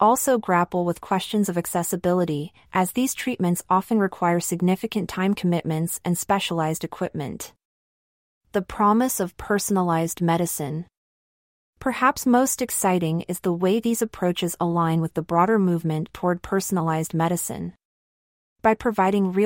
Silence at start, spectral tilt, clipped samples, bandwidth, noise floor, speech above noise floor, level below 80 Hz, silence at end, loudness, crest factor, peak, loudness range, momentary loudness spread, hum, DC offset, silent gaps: 0 s; -5 dB/octave; under 0.1%; 16.5 kHz; under -90 dBFS; over 68 dB; -54 dBFS; 0 s; -23 LUFS; 18 dB; -6 dBFS; 3 LU; 8 LU; none; under 0.1%; 7.65-8.41 s, 10.97-11.73 s, 17.85-18.56 s